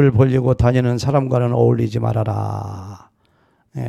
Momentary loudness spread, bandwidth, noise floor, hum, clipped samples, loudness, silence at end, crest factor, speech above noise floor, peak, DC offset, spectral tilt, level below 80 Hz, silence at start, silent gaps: 16 LU; 8.8 kHz; -59 dBFS; none; under 0.1%; -17 LUFS; 0 s; 16 dB; 43 dB; -2 dBFS; under 0.1%; -8.5 dB/octave; -38 dBFS; 0 s; none